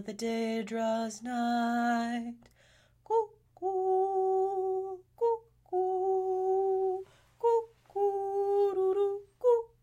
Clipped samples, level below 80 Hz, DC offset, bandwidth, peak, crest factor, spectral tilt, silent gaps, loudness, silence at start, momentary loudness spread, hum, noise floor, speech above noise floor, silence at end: under 0.1%; -72 dBFS; under 0.1%; 14.5 kHz; -16 dBFS; 14 dB; -5 dB/octave; none; -31 LUFS; 0 s; 8 LU; none; -64 dBFS; 33 dB; 0.15 s